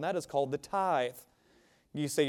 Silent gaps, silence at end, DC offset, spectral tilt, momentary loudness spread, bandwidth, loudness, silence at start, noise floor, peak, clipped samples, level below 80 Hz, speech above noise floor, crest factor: none; 0 s; under 0.1%; -4.5 dB/octave; 12 LU; 17.5 kHz; -33 LUFS; 0 s; -66 dBFS; -16 dBFS; under 0.1%; -72 dBFS; 34 dB; 18 dB